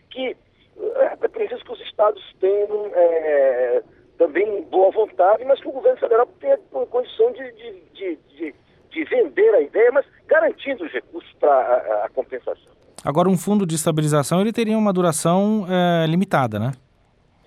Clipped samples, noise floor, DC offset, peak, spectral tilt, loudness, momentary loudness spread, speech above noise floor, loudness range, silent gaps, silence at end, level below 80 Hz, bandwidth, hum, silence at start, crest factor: under 0.1%; -59 dBFS; under 0.1%; -4 dBFS; -6 dB/octave; -20 LUFS; 14 LU; 39 dB; 3 LU; none; 0.7 s; -64 dBFS; 15 kHz; none; 0.1 s; 16 dB